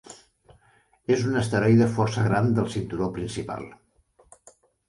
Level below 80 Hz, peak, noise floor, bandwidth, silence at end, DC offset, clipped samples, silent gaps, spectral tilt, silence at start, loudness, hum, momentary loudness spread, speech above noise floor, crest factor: -52 dBFS; -8 dBFS; -62 dBFS; 11.5 kHz; 1.15 s; under 0.1%; under 0.1%; none; -7 dB/octave; 0.1 s; -24 LUFS; none; 15 LU; 39 dB; 18 dB